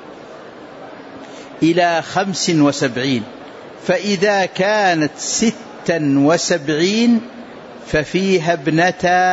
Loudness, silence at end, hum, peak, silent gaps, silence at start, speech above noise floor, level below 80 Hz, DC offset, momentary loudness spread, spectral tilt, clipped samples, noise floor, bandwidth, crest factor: -16 LUFS; 0 s; none; -4 dBFS; none; 0 s; 20 dB; -50 dBFS; under 0.1%; 21 LU; -4.5 dB/octave; under 0.1%; -36 dBFS; 8 kHz; 14 dB